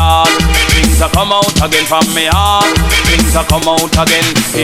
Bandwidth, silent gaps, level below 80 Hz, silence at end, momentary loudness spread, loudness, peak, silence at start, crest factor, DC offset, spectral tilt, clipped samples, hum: 16.5 kHz; none; -16 dBFS; 0 s; 2 LU; -9 LUFS; 0 dBFS; 0 s; 10 dB; under 0.1%; -3.5 dB/octave; under 0.1%; none